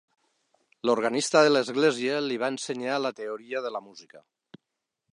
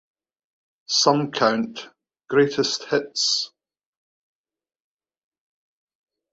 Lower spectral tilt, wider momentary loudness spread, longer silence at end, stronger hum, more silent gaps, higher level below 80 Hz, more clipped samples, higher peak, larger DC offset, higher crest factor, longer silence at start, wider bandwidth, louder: about the same, -3.5 dB/octave vs -3 dB/octave; about the same, 12 LU vs 10 LU; second, 0.95 s vs 2.85 s; neither; neither; second, -82 dBFS vs -70 dBFS; neither; second, -6 dBFS vs -2 dBFS; neither; about the same, 22 dB vs 22 dB; about the same, 0.85 s vs 0.9 s; first, 11 kHz vs 8 kHz; second, -26 LUFS vs -21 LUFS